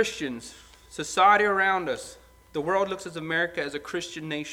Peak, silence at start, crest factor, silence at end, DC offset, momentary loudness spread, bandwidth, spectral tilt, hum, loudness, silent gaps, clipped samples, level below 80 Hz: -6 dBFS; 0 s; 20 dB; 0 s; under 0.1%; 17 LU; 16.5 kHz; -3.5 dB/octave; none; -26 LUFS; none; under 0.1%; -60 dBFS